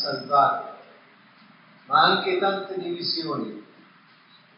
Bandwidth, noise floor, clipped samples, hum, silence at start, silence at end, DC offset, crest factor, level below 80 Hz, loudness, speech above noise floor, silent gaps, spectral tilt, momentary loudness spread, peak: 5.6 kHz; -55 dBFS; under 0.1%; none; 0 s; 0.95 s; under 0.1%; 22 dB; under -90 dBFS; -23 LUFS; 31 dB; none; -1.5 dB/octave; 15 LU; -4 dBFS